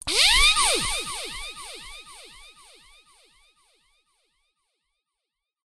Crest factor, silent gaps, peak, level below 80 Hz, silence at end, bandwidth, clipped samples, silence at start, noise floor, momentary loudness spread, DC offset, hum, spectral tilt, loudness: 24 dB; none; -4 dBFS; -40 dBFS; 3.4 s; 13 kHz; under 0.1%; 0.05 s; -85 dBFS; 26 LU; under 0.1%; none; 0.5 dB/octave; -19 LUFS